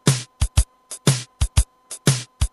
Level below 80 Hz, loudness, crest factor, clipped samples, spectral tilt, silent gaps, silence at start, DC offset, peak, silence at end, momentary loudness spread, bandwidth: -26 dBFS; -23 LUFS; 18 dB; under 0.1%; -4 dB/octave; none; 0.05 s; under 0.1%; -4 dBFS; 0.05 s; 3 LU; 14 kHz